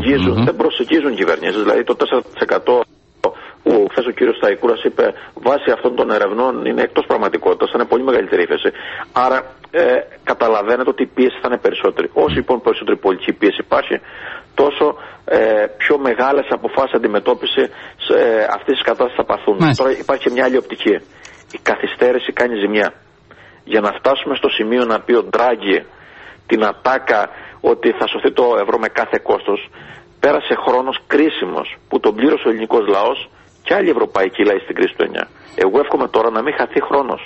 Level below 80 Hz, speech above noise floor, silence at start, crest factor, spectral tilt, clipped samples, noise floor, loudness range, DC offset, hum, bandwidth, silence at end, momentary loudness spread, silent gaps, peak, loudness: -48 dBFS; 29 dB; 0 s; 14 dB; -6.5 dB/octave; under 0.1%; -44 dBFS; 1 LU; under 0.1%; none; 8 kHz; 0 s; 6 LU; none; -2 dBFS; -16 LUFS